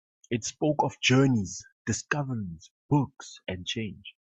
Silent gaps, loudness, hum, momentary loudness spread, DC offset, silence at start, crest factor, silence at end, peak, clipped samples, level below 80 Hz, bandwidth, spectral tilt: 1.72-1.85 s, 2.71-2.89 s; -28 LUFS; none; 16 LU; under 0.1%; 0.3 s; 20 dB; 0.2 s; -8 dBFS; under 0.1%; -62 dBFS; 8.4 kHz; -5 dB/octave